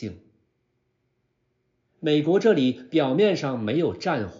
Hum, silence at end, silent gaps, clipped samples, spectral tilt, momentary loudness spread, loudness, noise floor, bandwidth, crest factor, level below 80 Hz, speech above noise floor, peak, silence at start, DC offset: none; 0 s; none; under 0.1%; -5 dB/octave; 7 LU; -23 LUFS; -73 dBFS; 7.4 kHz; 18 dB; -66 dBFS; 50 dB; -8 dBFS; 0 s; under 0.1%